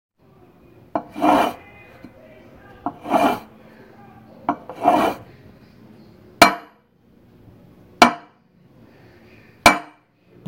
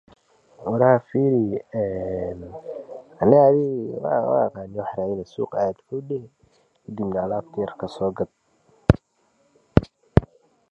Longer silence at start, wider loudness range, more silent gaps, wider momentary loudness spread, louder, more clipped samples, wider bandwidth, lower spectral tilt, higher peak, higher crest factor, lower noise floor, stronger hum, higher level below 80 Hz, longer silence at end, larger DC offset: first, 0.95 s vs 0.6 s; about the same, 5 LU vs 7 LU; neither; first, 18 LU vs 15 LU; first, -19 LUFS vs -23 LUFS; neither; first, 16 kHz vs 8.2 kHz; second, -3.5 dB/octave vs -9.5 dB/octave; about the same, 0 dBFS vs 0 dBFS; about the same, 24 dB vs 22 dB; second, -55 dBFS vs -65 dBFS; neither; second, -50 dBFS vs -40 dBFS; first, 0.65 s vs 0.45 s; neither